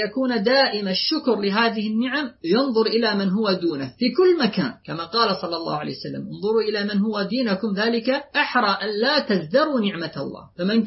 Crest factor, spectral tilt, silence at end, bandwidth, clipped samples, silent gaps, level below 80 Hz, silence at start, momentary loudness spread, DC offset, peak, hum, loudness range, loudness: 16 dB; -8.5 dB/octave; 0 s; 6 kHz; under 0.1%; none; -64 dBFS; 0 s; 9 LU; under 0.1%; -6 dBFS; none; 3 LU; -21 LUFS